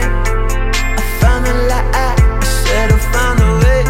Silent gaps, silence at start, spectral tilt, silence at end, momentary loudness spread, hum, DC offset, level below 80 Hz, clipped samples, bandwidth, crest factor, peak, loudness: none; 0 s; -5 dB/octave; 0 s; 5 LU; none; under 0.1%; -14 dBFS; under 0.1%; 16.5 kHz; 10 dB; 0 dBFS; -14 LUFS